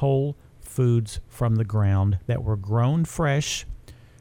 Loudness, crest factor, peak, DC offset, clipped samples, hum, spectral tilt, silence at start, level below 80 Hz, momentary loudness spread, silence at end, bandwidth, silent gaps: -24 LUFS; 12 dB; -12 dBFS; under 0.1%; under 0.1%; none; -6.5 dB/octave; 0 s; -42 dBFS; 12 LU; 0.3 s; 16 kHz; none